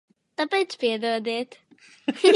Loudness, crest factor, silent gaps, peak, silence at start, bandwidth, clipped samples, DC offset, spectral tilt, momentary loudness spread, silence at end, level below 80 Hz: -26 LUFS; 20 dB; none; -4 dBFS; 0.4 s; 11.5 kHz; under 0.1%; under 0.1%; -3 dB/octave; 10 LU; 0 s; -84 dBFS